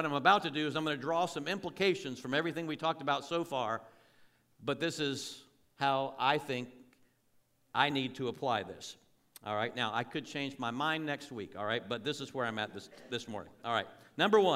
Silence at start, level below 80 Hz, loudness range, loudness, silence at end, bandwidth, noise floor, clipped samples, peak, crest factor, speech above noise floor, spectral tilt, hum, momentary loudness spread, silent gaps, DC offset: 0 s; -76 dBFS; 3 LU; -34 LUFS; 0 s; 16 kHz; -72 dBFS; under 0.1%; -12 dBFS; 22 dB; 38 dB; -4.5 dB/octave; none; 11 LU; none; under 0.1%